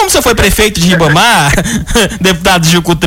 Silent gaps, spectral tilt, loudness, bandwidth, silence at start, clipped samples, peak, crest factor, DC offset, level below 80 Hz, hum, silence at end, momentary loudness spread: none; -3.5 dB/octave; -8 LUFS; 17 kHz; 0 s; under 0.1%; -2 dBFS; 8 dB; under 0.1%; -22 dBFS; none; 0 s; 4 LU